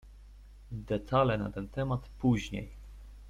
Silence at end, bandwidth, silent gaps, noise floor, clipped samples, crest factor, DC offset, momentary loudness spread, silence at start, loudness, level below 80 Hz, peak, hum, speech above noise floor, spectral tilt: 0 s; 11.5 kHz; none; -52 dBFS; under 0.1%; 20 dB; under 0.1%; 19 LU; 0.05 s; -32 LUFS; -48 dBFS; -14 dBFS; none; 20 dB; -7.5 dB/octave